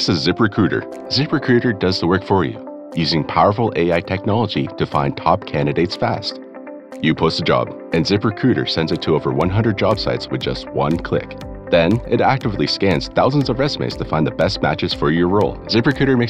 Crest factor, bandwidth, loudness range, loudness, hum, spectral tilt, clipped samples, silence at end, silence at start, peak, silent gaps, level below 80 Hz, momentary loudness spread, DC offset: 16 dB; 10 kHz; 2 LU; -18 LUFS; none; -6.5 dB/octave; under 0.1%; 0 s; 0 s; 0 dBFS; none; -40 dBFS; 7 LU; under 0.1%